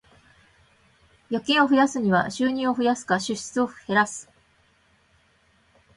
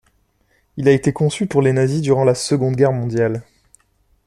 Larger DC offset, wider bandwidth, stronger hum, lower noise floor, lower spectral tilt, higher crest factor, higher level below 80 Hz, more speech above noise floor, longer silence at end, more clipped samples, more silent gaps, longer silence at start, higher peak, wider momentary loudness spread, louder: neither; about the same, 11.5 kHz vs 12.5 kHz; neither; about the same, -62 dBFS vs -62 dBFS; second, -4 dB/octave vs -6.5 dB/octave; about the same, 20 dB vs 16 dB; second, -64 dBFS vs -52 dBFS; second, 40 dB vs 45 dB; first, 1.75 s vs 0.85 s; neither; neither; first, 1.3 s vs 0.75 s; second, -6 dBFS vs -2 dBFS; first, 9 LU vs 5 LU; second, -23 LUFS vs -17 LUFS